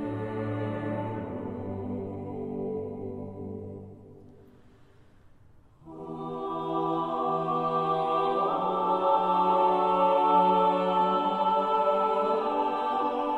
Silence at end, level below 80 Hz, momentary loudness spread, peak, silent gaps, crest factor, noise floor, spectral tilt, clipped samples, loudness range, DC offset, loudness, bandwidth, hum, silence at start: 0 s; -64 dBFS; 15 LU; -12 dBFS; none; 16 dB; -55 dBFS; -8 dB/octave; under 0.1%; 16 LU; under 0.1%; -27 LUFS; 9.2 kHz; none; 0 s